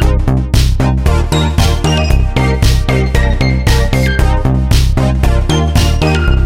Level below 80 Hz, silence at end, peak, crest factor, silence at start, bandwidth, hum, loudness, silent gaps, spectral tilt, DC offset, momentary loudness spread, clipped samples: -12 dBFS; 0 s; 0 dBFS; 10 dB; 0 s; 16 kHz; none; -12 LUFS; none; -6 dB/octave; under 0.1%; 1 LU; under 0.1%